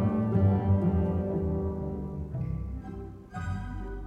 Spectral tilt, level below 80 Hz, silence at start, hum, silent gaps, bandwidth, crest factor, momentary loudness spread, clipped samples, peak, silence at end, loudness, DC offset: -10.5 dB/octave; -40 dBFS; 0 s; none; none; 4 kHz; 14 dB; 14 LU; under 0.1%; -14 dBFS; 0 s; -30 LUFS; under 0.1%